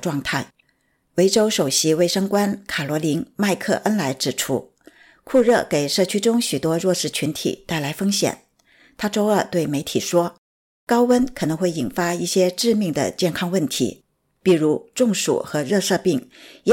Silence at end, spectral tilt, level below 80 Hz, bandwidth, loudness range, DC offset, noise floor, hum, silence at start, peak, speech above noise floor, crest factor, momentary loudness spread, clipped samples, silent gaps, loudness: 0 s; -4.5 dB/octave; -56 dBFS; 17 kHz; 2 LU; under 0.1%; -66 dBFS; none; 0 s; -6 dBFS; 46 dB; 14 dB; 8 LU; under 0.1%; 10.38-10.87 s; -21 LUFS